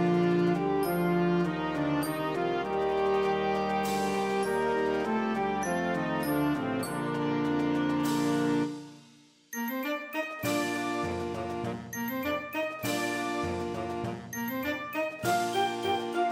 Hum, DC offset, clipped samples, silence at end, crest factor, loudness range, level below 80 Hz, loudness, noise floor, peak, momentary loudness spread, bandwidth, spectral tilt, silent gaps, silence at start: none; under 0.1%; under 0.1%; 0 s; 14 dB; 4 LU; -60 dBFS; -30 LUFS; -58 dBFS; -16 dBFS; 7 LU; 16 kHz; -5.5 dB/octave; none; 0 s